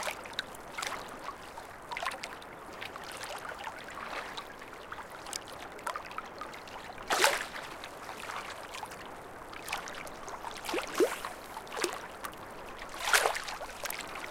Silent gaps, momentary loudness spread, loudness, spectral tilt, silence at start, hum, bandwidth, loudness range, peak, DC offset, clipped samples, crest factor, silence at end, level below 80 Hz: none; 16 LU; -36 LUFS; -1.5 dB/octave; 0 s; none; 17 kHz; 8 LU; -4 dBFS; under 0.1%; under 0.1%; 34 dB; 0 s; -60 dBFS